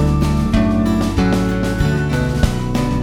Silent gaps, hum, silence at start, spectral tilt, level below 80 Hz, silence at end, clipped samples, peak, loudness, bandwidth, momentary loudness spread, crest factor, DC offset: none; none; 0 s; -7 dB/octave; -24 dBFS; 0 s; under 0.1%; 0 dBFS; -17 LUFS; 16 kHz; 3 LU; 14 dB; under 0.1%